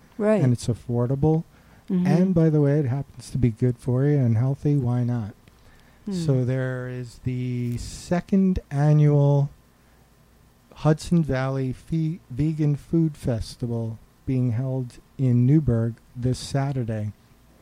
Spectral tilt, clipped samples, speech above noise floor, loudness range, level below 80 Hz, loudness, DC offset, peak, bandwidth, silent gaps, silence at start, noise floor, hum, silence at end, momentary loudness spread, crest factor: -8.5 dB/octave; under 0.1%; 34 dB; 4 LU; -46 dBFS; -24 LUFS; under 0.1%; -8 dBFS; 11 kHz; none; 0.2 s; -56 dBFS; none; 0.5 s; 11 LU; 16 dB